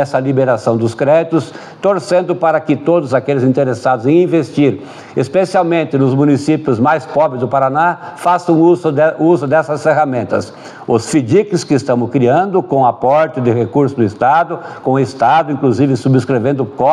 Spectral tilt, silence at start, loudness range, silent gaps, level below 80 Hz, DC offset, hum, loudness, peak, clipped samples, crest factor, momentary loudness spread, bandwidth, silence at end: -7 dB/octave; 0 s; 1 LU; none; -58 dBFS; under 0.1%; none; -13 LUFS; 0 dBFS; under 0.1%; 12 dB; 5 LU; 11.5 kHz; 0 s